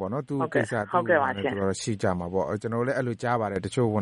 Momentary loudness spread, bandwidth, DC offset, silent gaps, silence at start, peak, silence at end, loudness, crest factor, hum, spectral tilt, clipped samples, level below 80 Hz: 5 LU; 11.5 kHz; under 0.1%; none; 0 s; -8 dBFS; 0 s; -27 LUFS; 18 dB; none; -6 dB/octave; under 0.1%; -60 dBFS